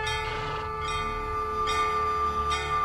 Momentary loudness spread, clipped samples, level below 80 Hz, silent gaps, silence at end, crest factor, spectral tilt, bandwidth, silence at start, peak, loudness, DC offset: 6 LU; under 0.1%; -40 dBFS; none; 0 s; 12 dB; -3.5 dB/octave; 13.5 kHz; 0 s; -16 dBFS; -28 LUFS; under 0.1%